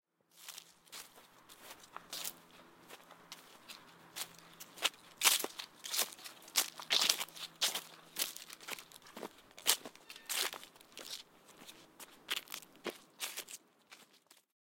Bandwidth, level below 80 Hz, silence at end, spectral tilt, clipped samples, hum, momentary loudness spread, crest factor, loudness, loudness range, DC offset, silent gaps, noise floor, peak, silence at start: 17 kHz; -84 dBFS; 0.65 s; 1.5 dB/octave; under 0.1%; none; 23 LU; 36 dB; -37 LUFS; 15 LU; under 0.1%; none; -67 dBFS; -6 dBFS; 0.35 s